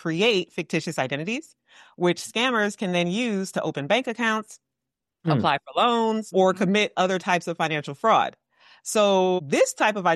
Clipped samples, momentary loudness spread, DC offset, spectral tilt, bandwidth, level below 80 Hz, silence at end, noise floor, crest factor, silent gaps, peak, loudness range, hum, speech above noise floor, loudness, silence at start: under 0.1%; 7 LU; under 0.1%; -4.5 dB/octave; 12.5 kHz; -74 dBFS; 0 s; -85 dBFS; 16 dB; none; -8 dBFS; 3 LU; none; 62 dB; -23 LUFS; 0.05 s